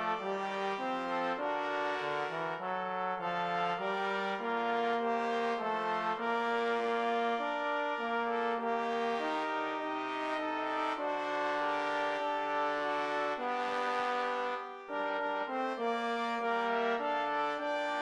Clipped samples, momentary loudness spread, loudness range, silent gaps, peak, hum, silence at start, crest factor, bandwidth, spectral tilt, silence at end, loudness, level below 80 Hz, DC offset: under 0.1%; 3 LU; 2 LU; none; -20 dBFS; none; 0 s; 14 dB; 11 kHz; -4.5 dB/octave; 0 s; -34 LUFS; -78 dBFS; under 0.1%